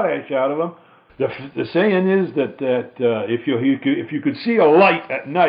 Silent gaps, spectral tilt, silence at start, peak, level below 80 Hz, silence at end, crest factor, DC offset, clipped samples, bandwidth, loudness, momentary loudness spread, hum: none; -11 dB/octave; 0 s; -2 dBFS; -66 dBFS; 0 s; 16 dB; under 0.1%; under 0.1%; 5.2 kHz; -19 LUFS; 11 LU; none